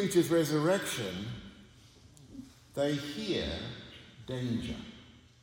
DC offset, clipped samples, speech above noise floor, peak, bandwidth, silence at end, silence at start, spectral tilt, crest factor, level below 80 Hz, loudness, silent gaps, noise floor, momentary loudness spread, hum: under 0.1%; under 0.1%; 26 dB; -14 dBFS; 17.5 kHz; 0.25 s; 0 s; -5 dB/octave; 20 dB; -58 dBFS; -33 LUFS; none; -57 dBFS; 22 LU; none